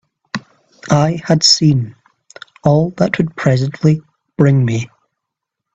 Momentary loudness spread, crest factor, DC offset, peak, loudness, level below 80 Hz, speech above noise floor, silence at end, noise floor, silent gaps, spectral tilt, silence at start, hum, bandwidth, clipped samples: 18 LU; 16 dB; under 0.1%; 0 dBFS; -14 LUFS; -50 dBFS; 66 dB; 0.9 s; -79 dBFS; none; -5 dB/octave; 0.35 s; none; 8.4 kHz; under 0.1%